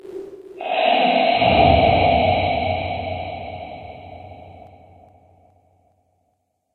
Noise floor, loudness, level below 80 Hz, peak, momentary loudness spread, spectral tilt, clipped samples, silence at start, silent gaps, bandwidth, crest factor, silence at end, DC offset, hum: -70 dBFS; -17 LUFS; -38 dBFS; -2 dBFS; 24 LU; -8 dB/octave; under 0.1%; 0.05 s; none; 4.5 kHz; 18 dB; 2.1 s; under 0.1%; none